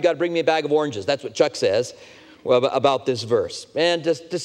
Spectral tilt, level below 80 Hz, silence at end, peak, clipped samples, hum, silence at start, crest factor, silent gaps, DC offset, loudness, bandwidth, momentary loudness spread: -4.5 dB/octave; -66 dBFS; 0 s; -4 dBFS; under 0.1%; none; 0 s; 18 dB; none; under 0.1%; -21 LUFS; 11 kHz; 6 LU